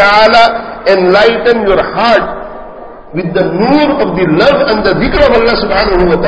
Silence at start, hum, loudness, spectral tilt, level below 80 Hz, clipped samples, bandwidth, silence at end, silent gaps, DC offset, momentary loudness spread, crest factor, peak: 0 s; none; -9 LUFS; -6.5 dB/octave; -28 dBFS; 2%; 8 kHz; 0 s; none; under 0.1%; 13 LU; 8 dB; 0 dBFS